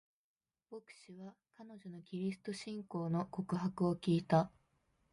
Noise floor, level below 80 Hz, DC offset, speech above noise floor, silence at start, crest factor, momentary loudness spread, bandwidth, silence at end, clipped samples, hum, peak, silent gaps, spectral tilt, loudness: -78 dBFS; -74 dBFS; under 0.1%; 39 dB; 0.7 s; 22 dB; 21 LU; 11.5 kHz; 0.65 s; under 0.1%; none; -16 dBFS; none; -7.5 dB/octave; -38 LUFS